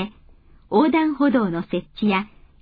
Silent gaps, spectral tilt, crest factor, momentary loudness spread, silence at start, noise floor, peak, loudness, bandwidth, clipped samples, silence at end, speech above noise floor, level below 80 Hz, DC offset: none; -10 dB/octave; 16 dB; 11 LU; 0 s; -50 dBFS; -6 dBFS; -21 LUFS; 5 kHz; under 0.1%; 0.35 s; 30 dB; -50 dBFS; under 0.1%